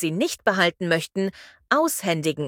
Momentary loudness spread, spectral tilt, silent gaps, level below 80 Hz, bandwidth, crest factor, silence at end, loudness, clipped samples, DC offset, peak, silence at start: 7 LU; -4 dB/octave; none; -66 dBFS; 17.5 kHz; 20 dB; 0 s; -23 LUFS; under 0.1%; under 0.1%; -4 dBFS; 0 s